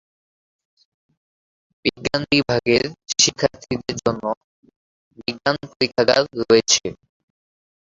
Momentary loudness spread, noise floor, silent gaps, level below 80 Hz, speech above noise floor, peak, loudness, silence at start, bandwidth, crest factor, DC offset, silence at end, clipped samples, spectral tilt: 11 LU; under -90 dBFS; 4.37-4.63 s, 4.76-5.11 s, 5.76-5.80 s; -52 dBFS; over 70 dB; 0 dBFS; -19 LUFS; 1.85 s; 7.8 kHz; 22 dB; under 0.1%; 0.9 s; under 0.1%; -3 dB/octave